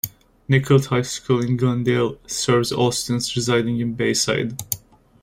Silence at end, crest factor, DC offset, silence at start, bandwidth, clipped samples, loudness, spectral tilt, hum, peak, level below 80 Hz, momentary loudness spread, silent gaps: 0.45 s; 18 dB; under 0.1%; 0.05 s; 16 kHz; under 0.1%; -21 LUFS; -5 dB/octave; none; -2 dBFS; -50 dBFS; 7 LU; none